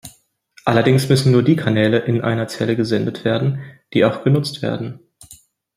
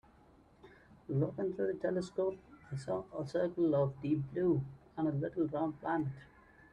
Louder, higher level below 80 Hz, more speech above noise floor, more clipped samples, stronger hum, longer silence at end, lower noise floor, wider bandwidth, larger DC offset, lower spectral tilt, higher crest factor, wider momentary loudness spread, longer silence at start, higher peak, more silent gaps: first, -18 LUFS vs -36 LUFS; first, -54 dBFS vs -66 dBFS; first, 36 dB vs 29 dB; neither; neither; about the same, 0.45 s vs 0.45 s; second, -53 dBFS vs -64 dBFS; first, 15.5 kHz vs 10 kHz; neither; second, -6.5 dB/octave vs -8.5 dB/octave; about the same, 18 dB vs 16 dB; about the same, 10 LU vs 11 LU; second, 0.05 s vs 0.65 s; first, 0 dBFS vs -20 dBFS; neither